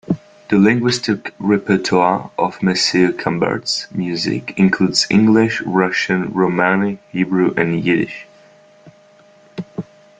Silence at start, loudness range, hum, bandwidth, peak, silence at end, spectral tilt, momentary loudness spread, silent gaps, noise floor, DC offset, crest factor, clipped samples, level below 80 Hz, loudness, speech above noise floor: 0.1 s; 3 LU; none; 9.4 kHz; 0 dBFS; 0.4 s; -5 dB/octave; 11 LU; none; -48 dBFS; under 0.1%; 16 dB; under 0.1%; -54 dBFS; -16 LUFS; 32 dB